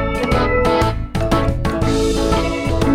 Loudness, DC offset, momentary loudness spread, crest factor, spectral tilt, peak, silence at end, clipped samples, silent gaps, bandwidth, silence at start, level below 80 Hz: -17 LUFS; under 0.1%; 4 LU; 14 dB; -6 dB/octave; -2 dBFS; 0 s; under 0.1%; none; 16 kHz; 0 s; -24 dBFS